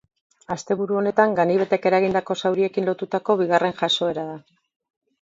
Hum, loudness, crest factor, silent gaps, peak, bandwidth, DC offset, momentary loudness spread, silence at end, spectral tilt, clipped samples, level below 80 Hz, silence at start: none; -21 LUFS; 20 dB; none; -2 dBFS; 7.8 kHz; under 0.1%; 11 LU; 0.8 s; -5 dB/octave; under 0.1%; -64 dBFS; 0.5 s